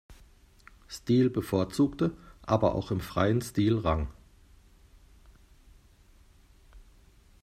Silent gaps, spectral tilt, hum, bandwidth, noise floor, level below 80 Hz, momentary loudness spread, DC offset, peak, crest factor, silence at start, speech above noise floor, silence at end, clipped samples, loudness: none; -7 dB/octave; none; 15.5 kHz; -58 dBFS; -48 dBFS; 12 LU; under 0.1%; -10 dBFS; 22 dB; 0.1 s; 31 dB; 0.65 s; under 0.1%; -28 LUFS